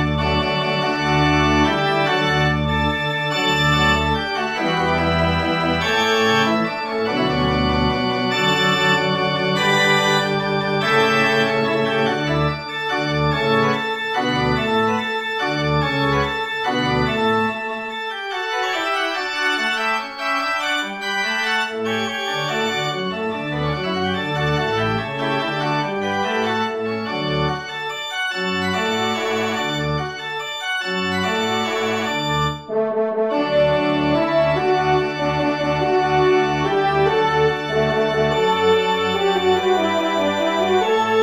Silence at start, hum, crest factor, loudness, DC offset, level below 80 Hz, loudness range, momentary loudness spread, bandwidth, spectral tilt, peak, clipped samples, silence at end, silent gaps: 0 s; none; 16 dB; -19 LUFS; under 0.1%; -40 dBFS; 4 LU; 6 LU; 16 kHz; -5 dB/octave; -4 dBFS; under 0.1%; 0 s; none